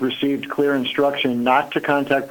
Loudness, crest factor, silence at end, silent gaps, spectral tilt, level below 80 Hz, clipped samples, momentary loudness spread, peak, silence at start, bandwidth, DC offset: -20 LUFS; 16 dB; 0 s; none; -5.5 dB/octave; -62 dBFS; under 0.1%; 3 LU; -4 dBFS; 0 s; 18 kHz; under 0.1%